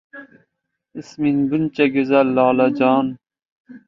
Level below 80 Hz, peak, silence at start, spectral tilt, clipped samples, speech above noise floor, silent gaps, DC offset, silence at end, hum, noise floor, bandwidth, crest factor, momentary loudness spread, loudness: -60 dBFS; -2 dBFS; 0.15 s; -7.5 dB/octave; under 0.1%; 59 dB; 3.45-3.65 s; under 0.1%; 0.1 s; none; -76 dBFS; 7.2 kHz; 18 dB; 17 LU; -17 LUFS